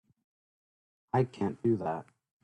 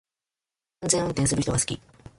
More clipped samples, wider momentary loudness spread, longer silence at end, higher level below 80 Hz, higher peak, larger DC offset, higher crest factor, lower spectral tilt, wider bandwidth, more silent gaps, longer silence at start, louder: neither; second, 6 LU vs 11 LU; about the same, 0.4 s vs 0.4 s; second, -68 dBFS vs -48 dBFS; second, -14 dBFS vs -4 dBFS; neither; about the same, 20 dB vs 24 dB; first, -9 dB/octave vs -4 dB/octave; second, 9.8 kHz vs 11.5 kHz; neither; first, 1.15 s vs 0.8 s; second, -32 LUFS vs -25 LUFS